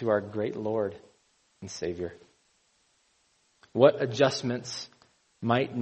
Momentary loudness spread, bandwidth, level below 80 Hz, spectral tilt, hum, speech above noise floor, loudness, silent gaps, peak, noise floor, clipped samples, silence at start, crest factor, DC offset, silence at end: 17 LU; 8.4 kHz; -66 dBFS; -5.5 dB/octave; none; 42 dB; -28 LUFS; none; -6 dBFS; -69 dBFS; under 0.1%; 0 s; 24 dB; under 0.1%; 0 s